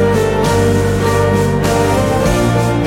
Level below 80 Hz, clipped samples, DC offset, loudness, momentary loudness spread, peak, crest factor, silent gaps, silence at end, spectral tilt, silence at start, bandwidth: -26 dBFS; under 0.1%; under 0.1%; -13 LUFS; 1 LU; -2 dBFS; 10 dB; none; 0 s; -6 dB/octave; 0 s; 16.5 kHz